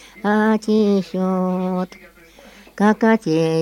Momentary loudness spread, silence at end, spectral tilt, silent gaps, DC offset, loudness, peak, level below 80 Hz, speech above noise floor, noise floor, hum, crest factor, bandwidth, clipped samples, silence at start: 6 LU; 0 s; -7 dB/octave; none; under 0.1%; -18 LUFS; -2 dBFS; -58 dBFS; 28 dB; -45 dBFS; none; 16 dB; 11.5 kHz; under 0.1%; 0.15 s